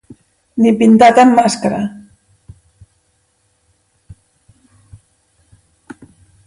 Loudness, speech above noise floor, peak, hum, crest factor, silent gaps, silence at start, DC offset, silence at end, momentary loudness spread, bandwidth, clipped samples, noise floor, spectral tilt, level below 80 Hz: -11 LUFS; 51 dB; 0 dBFS; none; 16 dB; none; 0.55 s; under 0.1%; 4.5 s; 16 LU; 11.5 kHz; under 0.1%; -61 dBFS; -5.5 dB/octave; -52 dBFS